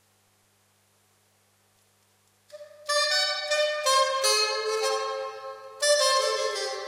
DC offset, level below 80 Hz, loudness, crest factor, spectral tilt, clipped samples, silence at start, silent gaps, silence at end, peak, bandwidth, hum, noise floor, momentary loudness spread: under 0.1%; -88 dBFS; -24 LUFS; 18 dB; 2.5 dB/octave; under 0.1%; 2.55 s; none; 0 s; -12 dBFS; 16 kHz; 50 Hz at -75 dBFS; -66 dBFS; 13 LU